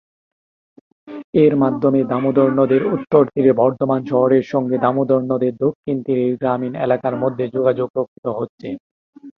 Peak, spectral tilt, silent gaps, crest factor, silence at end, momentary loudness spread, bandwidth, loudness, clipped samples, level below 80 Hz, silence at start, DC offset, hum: -2 dBFS; -10 dB/octave; 1.24-1.33 s, 5.75-5.83 s, 7.90-7.94 s, 8.08-8.23 s, 8.49-8.58 s, 8.80-9.13 s; 16 dB; 0.05 s; 10 LU; 6 kHz; -18 LUFS; under 0.1%; -60 dBFS; 1.05 s; under 0.1%; none